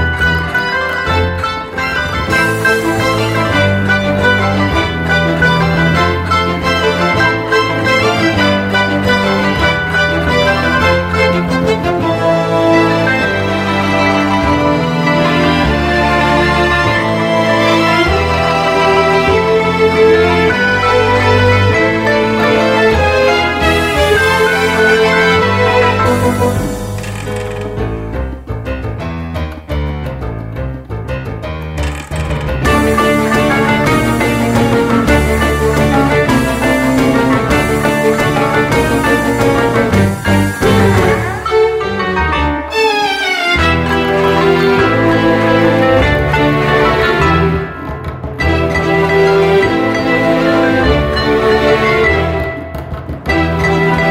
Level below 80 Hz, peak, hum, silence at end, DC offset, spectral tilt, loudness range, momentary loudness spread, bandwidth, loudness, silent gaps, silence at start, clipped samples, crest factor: -26 dBFS; 0 dBFS; none; 0 s; under 0.1%; -5.5 dB/octave; 5 LU; 10 LU; 16 kHz; -12 LUFS; none; 0 s; under 0.1%; 12 dB